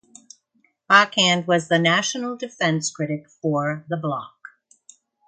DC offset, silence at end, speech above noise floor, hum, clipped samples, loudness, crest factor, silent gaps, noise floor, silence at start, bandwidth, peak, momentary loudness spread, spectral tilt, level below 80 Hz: under 0.1%; 1 s; 45 dB; none; under 0.1%; -20 LUFS; 22 dB; none; -66 dBFS; 0.9 s; 9.6 kHz; 0 dBFS; 13 LU; -3.5 dB/octave; -68 dBFS